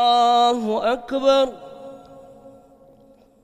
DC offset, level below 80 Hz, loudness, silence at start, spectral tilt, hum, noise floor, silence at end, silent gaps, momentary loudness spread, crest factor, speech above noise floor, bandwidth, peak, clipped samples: under 0.1%; -58 dBFS; -19 LUFS; 0 s; -3.5 dB/octave; none; -52 dBFS; 0.95 s; none; 24 LU; 16 dB; 34 dB; 12 kHz; -4 dBFS; under 0.1%